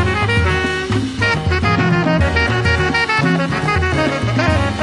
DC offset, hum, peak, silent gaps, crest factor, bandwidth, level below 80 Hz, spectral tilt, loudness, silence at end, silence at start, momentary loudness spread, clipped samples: under 0.1%; none; -2 dBFS; none; 12 dB; 11.5 kHz; -32 dBFS; -6 dB/octave; -16 LUFS; 0 s; 0 s; 2 LU; under 0.1%